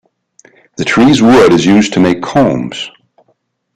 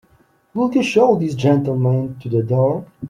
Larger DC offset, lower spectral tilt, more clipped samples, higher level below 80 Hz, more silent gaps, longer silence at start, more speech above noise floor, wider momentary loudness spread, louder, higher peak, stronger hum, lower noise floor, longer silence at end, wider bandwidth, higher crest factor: neither; second, -5.5 dB/octave vs -7.5 dB/octave; neither; first, -42 dBFS vs -56 dBFS; neither; first, 0.8 s vs 0.55 s; first, 51 dB vs 39 dB; first, 14 LU vs 7 LU; first, -9 LUFS vs -17 LUFS; about the same, 0 dBFS vs -2 dBFS; neither; about the same, -59 dBFS vs -56 dBFS; first, 0.9 s vs 0 s; first, 12 kHz vs 10.5 kHz; second, 10 dB vs 16 dB